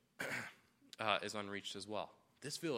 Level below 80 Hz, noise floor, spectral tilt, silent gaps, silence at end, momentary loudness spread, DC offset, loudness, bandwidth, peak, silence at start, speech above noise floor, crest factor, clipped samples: -86 dBFS; -63 dBFS; -3 dB/octave; none; 0 s; 15 LU; under 0.1%; -43 LUFS; 16 kHz; -18 dBFS; 0.2 s; 21 dB; 26 dB; under 0.1%